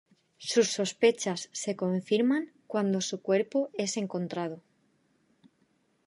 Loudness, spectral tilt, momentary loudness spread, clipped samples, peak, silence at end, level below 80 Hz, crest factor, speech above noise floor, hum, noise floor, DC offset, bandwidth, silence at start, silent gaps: -29 LUFS; -4.5 dB/octave; 9 LU; under 0.1%; -10 dBFS; 1.5 s; -82 dBFS; 20 dB; 42 dB; none; -71 dBFS; under 0.1%; 11.5 kHz; 0.4 s; none